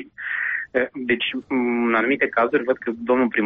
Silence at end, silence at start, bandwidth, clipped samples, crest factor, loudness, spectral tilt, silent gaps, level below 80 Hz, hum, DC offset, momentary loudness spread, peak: 0 s; 0 s; 4.5 kHz; under 0.1%; 14 dB; -22 LUFS; -2 dB/octave; none; -60 dBFS; none; under 0.1%; 5 LU; -8 dBFS